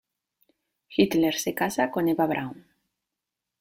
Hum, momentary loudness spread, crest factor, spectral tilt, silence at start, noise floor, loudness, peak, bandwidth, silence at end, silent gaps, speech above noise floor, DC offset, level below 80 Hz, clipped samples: none; 9 LU; 20 dB; -4.5 dB/octave; 0.9 s; -86 dBFS; -25 LUFS; -6 dBFS; 16.5 kHz; 1 s; none; 62 dB; under 0.1%; -64 dBFS; under 0.1%